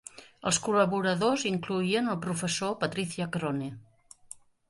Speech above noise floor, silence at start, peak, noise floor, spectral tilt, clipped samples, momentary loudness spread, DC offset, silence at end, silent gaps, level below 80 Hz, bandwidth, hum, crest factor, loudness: 23 dB; 0.15 s; -12 dBFS; -52 dBFS; -4 dB/octave; under 0.1%; 16 LU; under 0.1%; 0.85 s; none; -66 dBFS; 11.5 kHz; none; 18 dB; -29 LUFS